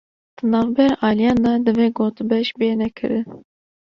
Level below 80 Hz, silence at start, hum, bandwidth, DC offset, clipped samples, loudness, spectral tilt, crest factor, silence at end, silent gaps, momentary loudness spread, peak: -50 dBFS; 0.45 s; none; 6.8 kHz; under 0.1%; under 0.1%; -19 LUFS; -7.5 dB/octave; 16 dB; 0.6 s; none; 7 LU; -2 dBFS